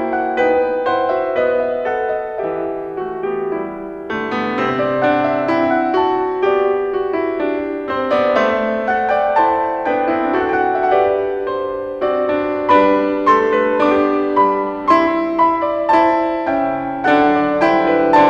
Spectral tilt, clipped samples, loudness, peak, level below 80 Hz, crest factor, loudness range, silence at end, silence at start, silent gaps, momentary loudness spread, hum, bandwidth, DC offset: -6.5 dB/octave; under 0.1%; -16 LUFS; -2 dBFS; -50 dBFS; 14 dB; 5 LU; 0 s; 0 s; none; 8 LU; none; 7.8 kHz; under 0.1%